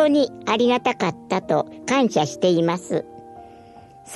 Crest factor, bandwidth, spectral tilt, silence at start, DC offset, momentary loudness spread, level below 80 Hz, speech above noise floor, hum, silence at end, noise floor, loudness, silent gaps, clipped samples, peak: 16 dB; 12 kHz; -5 dB/octave; 0 s; under 0.1%; 9 LU; -64 dBFS; 25 dB; none; 0 s; -45 dBFS; -21 LUFS; none; under 0.1%; -6 dBFS